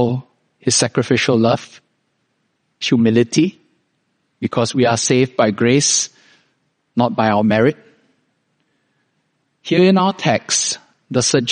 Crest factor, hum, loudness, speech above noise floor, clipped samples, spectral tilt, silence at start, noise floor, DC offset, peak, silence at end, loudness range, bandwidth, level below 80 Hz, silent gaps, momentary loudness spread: 18 dB; none; -16 LUFS; 52 dB; under 0.1%; -4 dB/octave; 0 s; -67 dBFS; under 0.1%; 0 dBFS; 0 s; 4 LU; 10 kHz; -58 dBFS; none; 11 LU